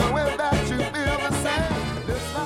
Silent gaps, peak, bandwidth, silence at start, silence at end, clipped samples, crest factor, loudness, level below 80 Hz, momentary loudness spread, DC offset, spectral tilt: none; -6 dBFS; 16.5 kHz; 0 s; 0 s; under 0.1%; 18 dB; -24 LUFS; -36 dBFS; 5 LU; under 0.1%; -5 dB/octave